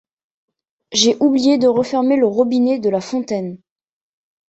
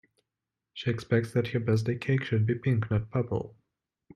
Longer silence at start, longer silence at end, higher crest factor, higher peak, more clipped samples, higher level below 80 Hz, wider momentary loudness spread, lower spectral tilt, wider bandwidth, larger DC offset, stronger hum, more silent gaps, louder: first, 0.9 s vs 0.75 s; first, 0.95 s vs 0.65 s; about the same, 16 dB vs 16 dB; first, -2 dBFS vs -12 dBFS; neither; about the same, -62 dBFS vs -58 dBFS; about the same, 9 LU vs 8 LU; second, -4 dB/octave vs -8 dB/octave; second, 8.2 kHz vs 10.5 kHz; neither; neither; neither; first, -16 LUFS vs -29 LUFS